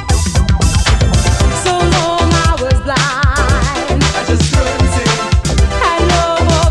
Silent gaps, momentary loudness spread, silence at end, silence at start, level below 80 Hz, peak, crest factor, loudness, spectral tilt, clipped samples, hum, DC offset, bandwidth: none; 2 LU; 0 s; 0 s; -16 dBFS; 0 dBFS; 12 dB; -12 LUFS; -4.5 dB/octave; under 0.1%; none; under 0.1%; 12.5 kHz